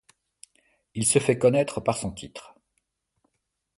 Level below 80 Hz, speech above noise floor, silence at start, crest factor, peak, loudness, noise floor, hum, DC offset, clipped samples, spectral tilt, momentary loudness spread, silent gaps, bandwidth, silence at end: -56 dBFS; 55 dB; 0.95 s; 22 dB; -6 dBFS; -24 LUFS; -79 dBFS; none; under 0.1%; under 0.1%; -4.5 dB/octave; 20 LU; none; 11.5 kHz; 1.35 s